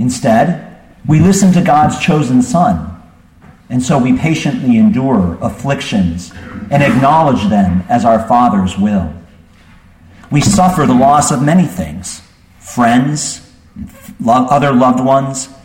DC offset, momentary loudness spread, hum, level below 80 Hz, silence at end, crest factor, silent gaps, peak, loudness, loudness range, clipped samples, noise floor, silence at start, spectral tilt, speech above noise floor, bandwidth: under 0.1%; 15 LU; none; -38 dBFS; 0.1 s; 12 dB; none; 0 dBFS; -11 LUFS; 2 LU; under 0.1%; -42 dBFS; 0 s; -6 dB/octave; 31 dB; 16.5 kHz